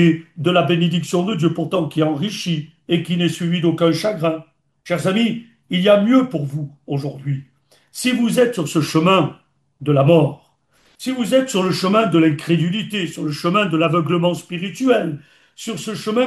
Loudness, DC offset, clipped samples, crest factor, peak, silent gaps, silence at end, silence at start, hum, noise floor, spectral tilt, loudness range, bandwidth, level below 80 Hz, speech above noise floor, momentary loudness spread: -18 LUFS; under 0.1%; under 0.1%; 16 dB; -2 dBFS; none; 0 s; 0 s; none; -58 dBFS; -6 dB/octave; 2 LU; 12.5 kHz; -64 dBFS; 41 dB; 12 LU